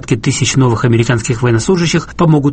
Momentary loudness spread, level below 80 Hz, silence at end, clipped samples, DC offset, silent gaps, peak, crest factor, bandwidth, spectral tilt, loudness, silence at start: 3 LU; -34 dBFS; 0 s; under 0.1%; under 0.1%; none; 0 dBFS; 10 dB; 8.8 kHz; -5.5 dB/octave; -12 LUFS; 0.05 s